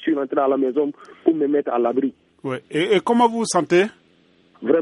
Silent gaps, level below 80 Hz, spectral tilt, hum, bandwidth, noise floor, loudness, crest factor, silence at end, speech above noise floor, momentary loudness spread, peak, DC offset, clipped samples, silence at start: none; -70 dBFS; -5 dB/octave; none; 11.5 kHz; -57 dBFS; -20 LUFS; 18 dB; 0 s; 37 dB; 10 LU; -4 dBFS; under 0.1%; under 0.1%; 0 s